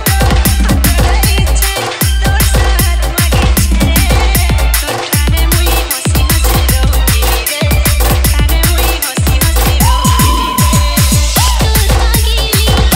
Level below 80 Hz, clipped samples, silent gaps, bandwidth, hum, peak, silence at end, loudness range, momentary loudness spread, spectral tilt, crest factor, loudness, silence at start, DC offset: -12 dBFS; under 0.1%; none; 16.5 kHz; none; 0 dBFS; 0 s; 1 LU; 3 LU; -4 dB/octave; 10 dB; -10 LUFS; 0 s; under 0.1%